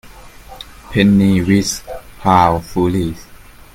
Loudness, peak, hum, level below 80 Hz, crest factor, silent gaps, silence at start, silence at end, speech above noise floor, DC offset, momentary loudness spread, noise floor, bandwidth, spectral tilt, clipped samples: -15 LUFS; 0 dBFS; none; -38 dBFS; 16 dB; none; 0.15 s; 0.4 s; 24 dB; under 0.1%; 22 LU; -37 dBFS; 16 kHz; -6 dB/octave; under 0.1%